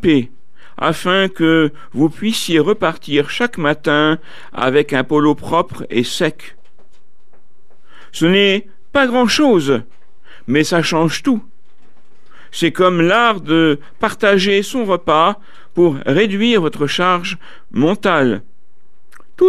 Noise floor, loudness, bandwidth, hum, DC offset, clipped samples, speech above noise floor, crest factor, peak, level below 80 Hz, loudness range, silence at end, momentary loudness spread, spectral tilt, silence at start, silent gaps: -61 dBFS; -15 LUFS; 14.5 kHz; none; 4%; under 0.1%; 47 dB; 16 dB; 0 dBFS; -52 dBFS; 4 LU; 0 s; 8 LU; -5 dB/octave; 0.05 s; none